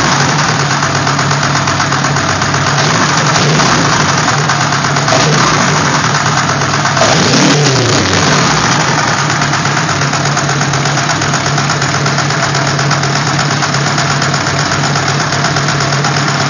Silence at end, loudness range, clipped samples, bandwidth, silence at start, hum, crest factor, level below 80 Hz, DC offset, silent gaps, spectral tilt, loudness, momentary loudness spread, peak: 0 s; 2 LU; under 0.1%; 8 kHz; 0 s; none; 10 dB; -36 dBFS; under 0.1%; none; -3.5 dB/octave; -10 LUFS; 3 LU; 0 dBFS